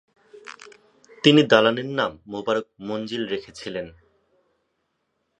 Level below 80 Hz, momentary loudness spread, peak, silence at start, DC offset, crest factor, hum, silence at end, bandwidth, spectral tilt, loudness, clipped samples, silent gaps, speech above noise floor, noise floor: -64 dBFS; 23 LU; 0 dBFS; 0.35 s; under 0.1%; 24 dB; none; 1.5 s; 9.6 kHz; -5.5 dB/octave; -22 LUFS; under 0.1%; none; 52 dB; -74 dBFS